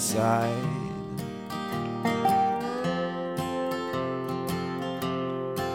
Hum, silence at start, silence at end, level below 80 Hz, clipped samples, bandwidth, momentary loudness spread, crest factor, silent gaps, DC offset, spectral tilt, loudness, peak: none; 0 s; 0 s; -60 dBFS; under 0.1%; 16.5 kHz; 10 LU; 18 dB; none; under 0.1%; -5 dB/octave; -29 LUFS; -10 dBFS